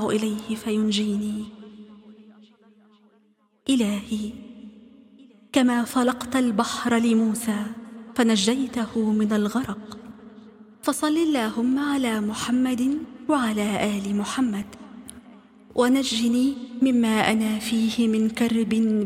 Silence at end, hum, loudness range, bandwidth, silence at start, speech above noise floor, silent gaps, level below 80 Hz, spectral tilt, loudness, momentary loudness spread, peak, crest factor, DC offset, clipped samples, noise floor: 0 s; none; 8 LU; 16 kHz; 0 s; 40 dB; none; -58 dBFS; -4.5 dB/octave; -23 LUFS; 15 LU; -4 dBFS; 20 dB; under 0.1%; under 0.1%; -63 dBFS